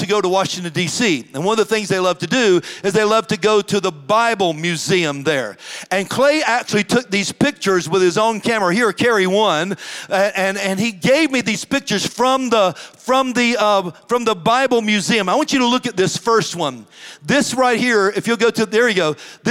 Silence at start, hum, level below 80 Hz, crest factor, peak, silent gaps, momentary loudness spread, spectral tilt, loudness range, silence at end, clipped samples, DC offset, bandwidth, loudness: 0 s; none; -60 dBFS; 14 dB; -2 dBFS; none; 6 LU; -4 dB/octave; 1 LU; 0 s; under 0.1%; under 0.1%; 16.5 kHz; -17 LUFS